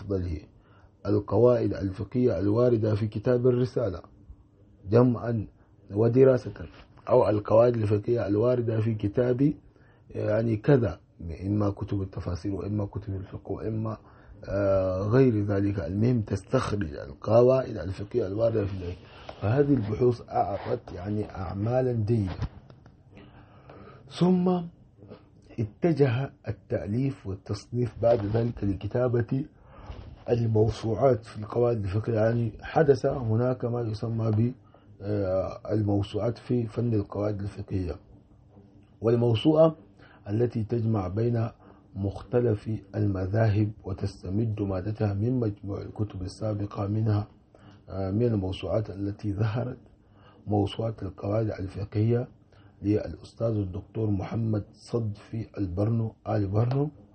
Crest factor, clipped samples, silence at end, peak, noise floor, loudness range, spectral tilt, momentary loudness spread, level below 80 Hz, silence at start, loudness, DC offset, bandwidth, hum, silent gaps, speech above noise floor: 20 dB; under 0.1%; 0.25 s; -8 dBFS; -56 dBFS; 6 LU; -9 dB/octave; 13 LU; -50 dBFS; 0 s; -27 LUFS; under 0.1%; 8.4 kHz; none; none; 30 dB